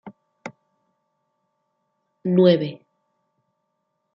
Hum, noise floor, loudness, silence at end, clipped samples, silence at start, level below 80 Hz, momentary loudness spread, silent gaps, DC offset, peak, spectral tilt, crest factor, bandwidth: none; -75 dBFS; -20 LUFS; 1.4 s; under 0.1%; 0.05 s; -72 dBFS; 24 LU; none; under 0.1%; -4 dBFS; -7 dB/octave; 22 dB; 6.2 kHz